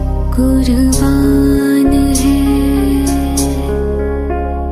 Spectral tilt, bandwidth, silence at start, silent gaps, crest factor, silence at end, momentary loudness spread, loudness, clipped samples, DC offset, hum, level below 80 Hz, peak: -6 dB/octave; 16 kHz; 0 s; none; 10 dB; 0 s; 6 LU; -13 LUFS; under 0.1%; under 0.1%; none; -18 dBFS; 0 dBFS